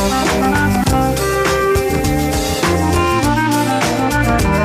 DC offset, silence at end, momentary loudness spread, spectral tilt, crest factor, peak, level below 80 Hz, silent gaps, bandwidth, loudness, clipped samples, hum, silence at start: under 0.1%; 0 s; 2 LU; -5 dB/octave; 12 dB; -2 dBFS; -26 dBFS; none; 15.5 kHz; -15 LUFS; under 0.1%; none; 0 s